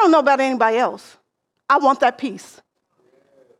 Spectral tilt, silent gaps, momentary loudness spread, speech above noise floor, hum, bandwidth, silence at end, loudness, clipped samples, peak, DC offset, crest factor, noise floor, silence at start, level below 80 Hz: -4 dB/octave; none; 23 LU; 44 dB; none; 12 kHz; 1.2 s; -17 LUFS; under 0.1%; -2 dBFS; under 0.1%; 16 dB; -62 dBFS; 0 s; -70 dBFS